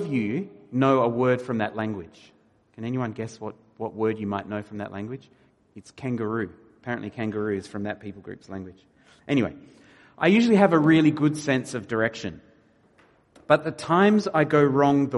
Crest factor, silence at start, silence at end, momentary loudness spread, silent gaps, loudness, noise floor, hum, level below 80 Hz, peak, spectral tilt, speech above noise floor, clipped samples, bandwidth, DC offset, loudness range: 20 dB; 0 s; 0 s; 18 LU; none; -24 LUFS; -59 dBFS; none; -64 dBFS; -4 dBFS; -7 dB/octave; 36 dB; under 0.1%; 11.5 kHz; under 0.1%; 10 LU